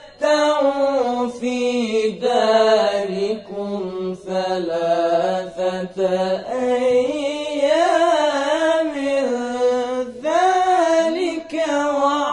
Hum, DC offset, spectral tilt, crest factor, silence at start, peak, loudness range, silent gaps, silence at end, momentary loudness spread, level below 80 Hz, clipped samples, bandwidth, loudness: none; under 0.1%; -4.5 dB/octave; 16 dB; 0 s; -4 dBFS; 3 LU; none; 0 s; 8 LU; -60 dBFS; under 0.1%; 11 kHz; -19 LUFS